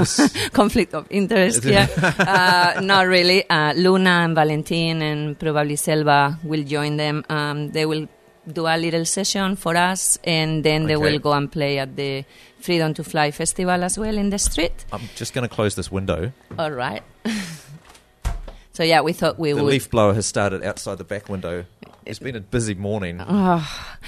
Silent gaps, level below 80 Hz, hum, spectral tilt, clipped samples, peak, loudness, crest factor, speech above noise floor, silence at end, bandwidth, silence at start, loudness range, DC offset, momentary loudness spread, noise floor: none; -40 dBFS; none; -4 dB/octave; under 0.1%; -2 dBFS; -20 LUFS; 18 dB; 27 dB; 0 s; 13.5 kHz; 0 s; 9 LU; under 0.1%; 14 LU; -47 dBFS